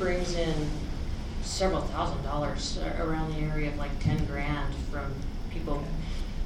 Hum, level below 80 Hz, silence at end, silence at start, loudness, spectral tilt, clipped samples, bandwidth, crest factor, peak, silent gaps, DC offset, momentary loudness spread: none; -32 dBFS; 0 s; 0 s; -32 LUFS; -5.5 dB/octave; under 0.1%; 11 kHz; 16 dB; -14 dBFS; none; under 0.1%; 7 LU